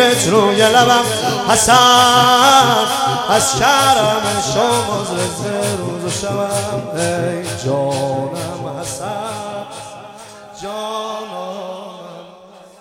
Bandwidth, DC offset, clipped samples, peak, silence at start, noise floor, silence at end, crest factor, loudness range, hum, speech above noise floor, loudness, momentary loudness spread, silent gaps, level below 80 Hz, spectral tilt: 17.5 kHz; under 0.1%; under 0.1%; 0 dBFS; 0 s; -41 dBFS; 0.2 s; 16 dB; 15 LU; none; 26 dB; -14 LUFS; 19 LU; none; -48 dBFS; -3 dB/octave